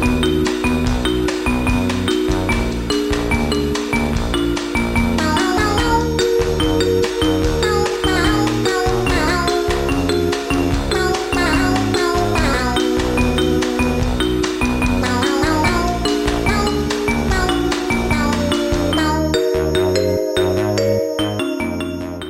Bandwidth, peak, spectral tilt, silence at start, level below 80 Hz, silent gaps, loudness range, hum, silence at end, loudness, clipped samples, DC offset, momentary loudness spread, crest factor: 16.5 kHz; -4 dBFS; -5 dB/octave; 0 s; -26 dBFS; none; 2 LU; none; 0 s; -17 LUFS; under 0.1%; under 0.1%; 3 LU; 14 dB